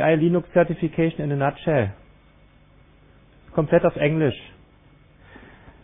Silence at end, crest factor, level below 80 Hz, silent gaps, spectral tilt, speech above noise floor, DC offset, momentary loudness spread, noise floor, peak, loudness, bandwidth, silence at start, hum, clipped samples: 1.35 s; 20 dB; -50 dBFS; none; -12 dB/octave; 33 dB; under 0.1%; 7 LU; -53 dBFS; -4 dBFS; -22 LUFS; 3.8 kHz; 0 s; none; under 0.1%